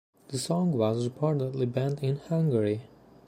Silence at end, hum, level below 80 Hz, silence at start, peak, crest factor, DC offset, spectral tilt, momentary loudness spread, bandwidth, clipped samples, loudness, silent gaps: 0.4 s; none; -66 dBFS; 0.3 s; -12 dBFS; 16 dB; under 0.1%; -7 dB/octave; 6 LU; 15.5 kHz; under 0.1%; -29 LUFS; none